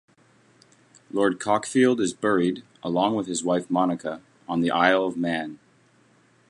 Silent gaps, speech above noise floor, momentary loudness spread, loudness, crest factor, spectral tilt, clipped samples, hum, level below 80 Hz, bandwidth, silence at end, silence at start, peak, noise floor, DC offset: none; 37 dB; 11 LU; -24 LUFS; 22 dB; -5 dB/octave; under 0.1%; none; -66 dBFS; 11.5 kHz; 0.95 s; 1.15 s; -4 dBFS; -60 dBFS; under 0.1%